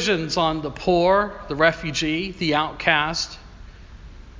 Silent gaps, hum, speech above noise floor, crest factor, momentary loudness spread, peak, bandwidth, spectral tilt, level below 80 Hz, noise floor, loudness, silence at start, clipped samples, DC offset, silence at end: none; none; 20 dB; 22 dB; 8 LU; -2 dBFS; 7.6 kHz; -4 dB/octave; -42 dBFS; -42 dBFS; -21 LUFS; 0 s; under 0.1%; under 0.1%; 0 s